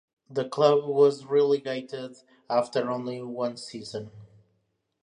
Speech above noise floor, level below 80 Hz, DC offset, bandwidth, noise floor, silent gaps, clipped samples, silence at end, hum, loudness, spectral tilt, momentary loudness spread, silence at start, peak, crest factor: 48 dB; -74 dBFS; under 0.1%; 10 kHz; -74 dBFS; none; under 0.1%; 0.8 s; none; -26 LUFS; -6 dB/octave; 17 LU; 0.3 s; -6 dBFS; 20 dB